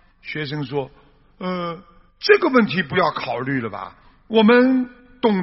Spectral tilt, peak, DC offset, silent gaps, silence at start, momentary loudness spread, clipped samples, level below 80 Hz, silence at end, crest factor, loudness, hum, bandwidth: -4 dB/octave; 0 dBFS; under 0.1%; none; 0.25 s; 17 LU; under 0.1%; -56 dBFS; 0 s; 20 dB; -19 LUFS; none; 6 kHz